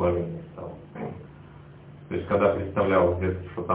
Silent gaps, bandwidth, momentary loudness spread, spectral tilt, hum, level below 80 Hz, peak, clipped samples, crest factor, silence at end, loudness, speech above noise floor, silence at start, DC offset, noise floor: none; 4 kHz; 25 LU; -11.5 dB/octave; none; -44 dBFS; -8 dBFS; under 0.1%; 20 dB; 0 s; -26 LUFS; 22 dB; 0 s; under 0.1%; -46 dBFS